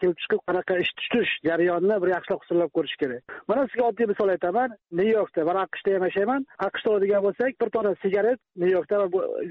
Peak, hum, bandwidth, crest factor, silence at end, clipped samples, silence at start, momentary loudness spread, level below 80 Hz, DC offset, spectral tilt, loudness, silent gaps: -12 dBFS; none; 4.8 kHz; 12 dB; 0 s; under 0.1%; 0 s; 4 LU; -66 dBFS; under 0.1%; -3.5 dB/octave; -25 LUFS; none